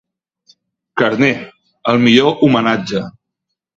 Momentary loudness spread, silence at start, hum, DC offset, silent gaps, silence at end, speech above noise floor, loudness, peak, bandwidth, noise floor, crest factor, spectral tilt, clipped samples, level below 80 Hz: 14 LU; 0.95 s; none; under 0.1%; none; 0.7 s; 64 dB; -14 LUFS; 0 dBFS; 7.6 kHz; -77 dBFS; 16 dB; -6 dB/octave; under 0.1%; -54 dBFS